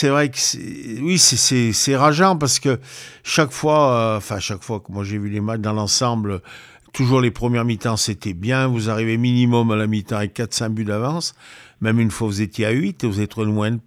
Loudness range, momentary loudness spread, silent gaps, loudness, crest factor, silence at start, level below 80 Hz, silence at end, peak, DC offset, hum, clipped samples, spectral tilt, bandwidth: 6 LU; 11 LU; none; -19 LUFS; 20 dB; 0 s; -50 dBFS; 0.05 s; 0 dBFS; under 0.1%; none; under 0.1%; -4 dB/octave; 16 kHz